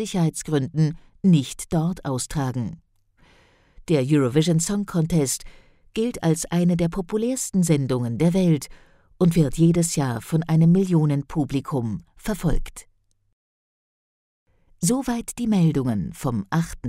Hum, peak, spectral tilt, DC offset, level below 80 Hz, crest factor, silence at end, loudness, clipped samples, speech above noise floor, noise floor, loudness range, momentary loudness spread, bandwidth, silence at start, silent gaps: none; -6 dBFS; -6.5 dB/octave; under 0.1%; -40 dBFS; 16 dB; 0 s; -22 LUFS; under 0.1%; 37 dB; -58 dBFS; 8 LU; 9 LU; 15.5 kHz; 0 s; 13.33-14.46 s